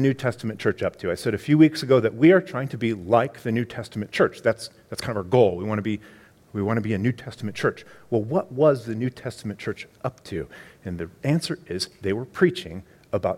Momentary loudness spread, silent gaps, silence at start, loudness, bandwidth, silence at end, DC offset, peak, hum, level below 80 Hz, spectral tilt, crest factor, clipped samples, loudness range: 16 LU; none; 0 s; -24 LUFS; 15.5 kHz; 0 s; under 0.1%; -4 dBFS; none; -56 dBFS; -6.5 dB/octave; 20 dB; under 0.1%; 6 LU